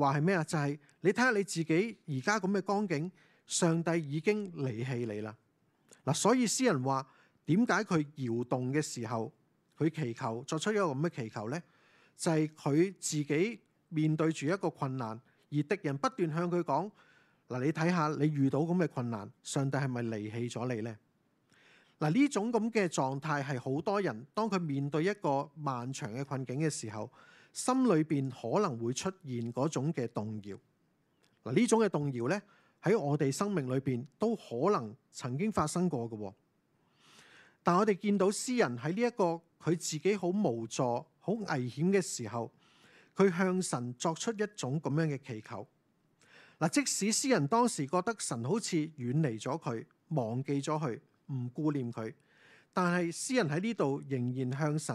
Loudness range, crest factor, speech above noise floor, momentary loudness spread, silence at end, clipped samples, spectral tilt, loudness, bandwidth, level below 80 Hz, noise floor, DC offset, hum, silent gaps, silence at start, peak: 4 LU; 22 dB; 42 dB; 11 LU; 0 s; under 0.1%; -5.5 dB/octave; -33 LUFS; 13.5 kHz; -78 dBFS; -74 dBFS; under 0.1%; none; none; 0 s; -12 dBFS